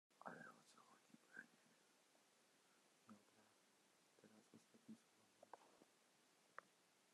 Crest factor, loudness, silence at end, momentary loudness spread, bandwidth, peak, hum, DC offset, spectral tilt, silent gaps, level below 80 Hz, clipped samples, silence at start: 32 dB; -64 LUFS; 0 s; 8 LU; 12.5 kHz; -38 dBFS; none; under 0.1%; -3.5 dB/octave; none; under -90 dBFS; under 0.1%; 0.1 s